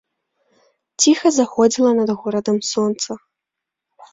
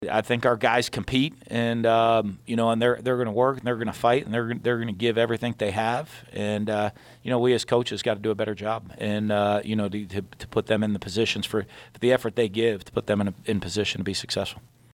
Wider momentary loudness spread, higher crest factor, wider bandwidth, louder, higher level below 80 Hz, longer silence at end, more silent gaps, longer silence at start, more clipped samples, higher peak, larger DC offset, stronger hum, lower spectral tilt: first, 12 LU vs 8 LU; about the same, 18 dB vs 18 dB; second, 8 kHz vs 16.5 kHz; first, -17 LUFS vs -25 LUFS; second, -64 dBFS vs -58 dBFS; second, 0.1 s vs 0.35 s; neither; first, 1 s vs 0 s; neither; first, -2 dBFS vs -8 dBFS; neither; neither; second, -3.5 dB/octave vs -5.5 dB/octave